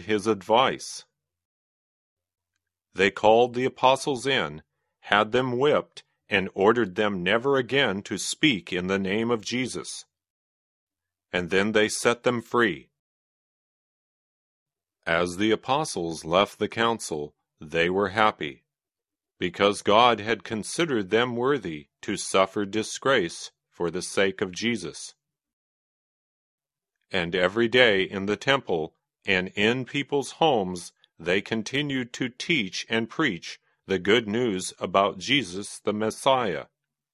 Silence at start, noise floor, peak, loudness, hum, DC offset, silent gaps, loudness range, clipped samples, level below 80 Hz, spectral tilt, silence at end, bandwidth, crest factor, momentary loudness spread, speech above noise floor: 0 s; under -90 dBFS; -2 dBFS; -25 LUFS; none; under 0.1%; 1.45-2.17 s, 10.30-10.87 s, 12.99-14.66 s, 25.53-26.58 s; 5 LU; under 0.1%; -58 dBFS; -4 dB/octave; 0.5 s; 14 kHz; 24 dB; 13 LU; over 65 dB